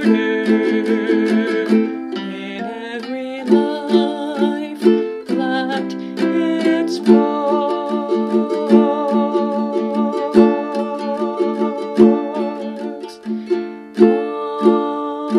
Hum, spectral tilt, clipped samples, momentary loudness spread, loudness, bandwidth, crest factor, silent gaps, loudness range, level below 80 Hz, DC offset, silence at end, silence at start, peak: none; -7 dB/octave; under 0.1%; 12 LU; -18 LUFS; 11 kHz; 16 dB; none; 3 LU; -62 dBFS; under 0.1%; 0 s; 0 s; 0 dBFS